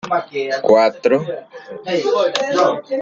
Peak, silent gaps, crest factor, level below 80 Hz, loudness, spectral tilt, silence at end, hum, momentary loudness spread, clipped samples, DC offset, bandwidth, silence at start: 0 dBFS; none; 16 dB; -64 dBFS; -17 LUFS; -4.5 dB/octave; 0 s; none; 16 LU; under 0.1%; under 0.1%; 7.8 kHz; 0.05 s